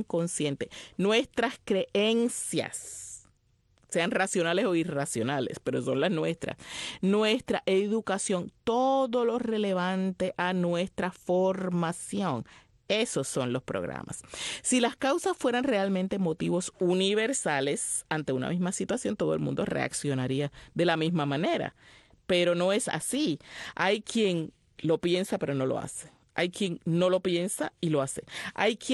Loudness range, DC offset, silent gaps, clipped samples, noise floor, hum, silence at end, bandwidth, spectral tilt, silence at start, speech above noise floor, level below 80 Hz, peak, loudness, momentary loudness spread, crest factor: 2 LU; under 0.1%; none; under 0.1%; -68 dBFS; none; 0 s; 12.5 kHz; -4.5 dB/octave; 0 s; 39 dB; -64 dBFS; -12 dBFS; -29 LUFS; 9 LU; 16 dB